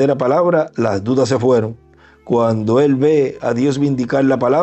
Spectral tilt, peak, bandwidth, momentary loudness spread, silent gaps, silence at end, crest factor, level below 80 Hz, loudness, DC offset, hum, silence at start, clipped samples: -7.5 dB/octave; -4 dBFS; 8.4 kHz; 5 LU; none; 0 s; 12 dB; -54 dBFS; -15 LUFS; under 0.1%; none; 0 s; under 0.1%